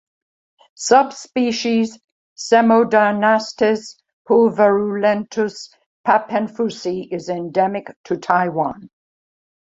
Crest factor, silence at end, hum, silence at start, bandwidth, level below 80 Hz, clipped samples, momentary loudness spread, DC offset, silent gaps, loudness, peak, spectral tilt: 18 dB; 0.75 s; none; 0.8 s; 8 kHz; -62 dBFS; under 0.1%; 12 LU; under 0.1%; 2.04-2.36 s, 4.13-4.25 s, 5.86-6.04 s, 7.96-8.04 s; -18 LUFS; 0 dBFS; -4.5 dB/octave